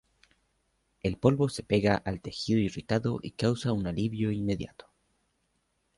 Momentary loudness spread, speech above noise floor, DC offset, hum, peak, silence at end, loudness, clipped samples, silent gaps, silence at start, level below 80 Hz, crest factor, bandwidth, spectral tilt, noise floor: 9 LU; 47 dB; under 0.1%; none; -8 dBFS; 1.3 s; -29 LUFS; under 0.1%; none; 1.05 s; -52 dBFS; 22 dB; 11.5 kHz; -6.5 dB/octave; -75 dBFS